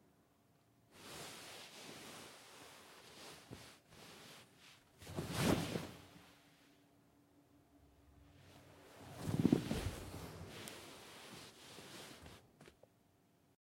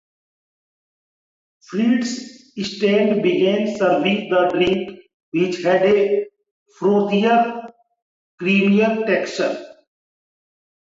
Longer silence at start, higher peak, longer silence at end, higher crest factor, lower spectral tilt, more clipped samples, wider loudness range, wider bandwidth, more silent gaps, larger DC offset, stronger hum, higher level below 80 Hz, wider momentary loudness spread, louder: second, 0.9 s vs 1.7 s; second, -16 dBFS vs -6 dBFS; second, 0.95 s vs 1.3 s; first, 30 dB vs 14 dB; about the same, -5 dB/octave vs -6 dB/octave; neither; first, 13 LU vs 3 LU; first, 16.5 kHz vs 7.8 kHz; second, none vs 5.14-5.32 s, 6.51-6.66 s, 8.02-8.38 s; neither; neither; about the same, -64 dBFS vs -60 dBFS; first, 25 LU vs 12 LU; second, -44 LUFS vs -18 LUFS